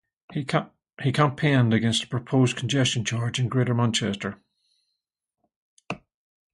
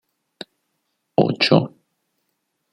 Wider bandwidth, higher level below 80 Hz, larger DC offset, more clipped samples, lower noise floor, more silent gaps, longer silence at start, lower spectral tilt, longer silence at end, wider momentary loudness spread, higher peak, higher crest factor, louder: first, 11.5 kHz vs 9.8 kHz; first, -58 dBFS vs -64 dBFS; neither; neither; first, -81 dBFS vs -74 dBFS; first, 5.56-5.77 s vs none; second, 0.3 s vs 1.2 s; second, -5 dB/octave vs -6.5 dB/octave; second, 0.6 s vs 1.05 s; second, 15 LU vs 23 LU; second, -6 dBFS vs -2 dBFS; about the same, 20 dB vs 22 dB; second, -24 LUFS vs -18 LUFS